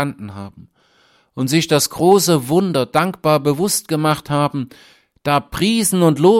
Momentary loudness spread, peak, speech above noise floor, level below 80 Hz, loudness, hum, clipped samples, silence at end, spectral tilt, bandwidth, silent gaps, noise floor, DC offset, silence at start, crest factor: 17 LU; -2 dBFS; 40 dB; -50 dBFS; -16 LUFS; none; under 0.1%; 0 s; -5 dB/octave; 16.5 kHz; none; -56 dBFS; under 0.1%; 0 s; 16 dB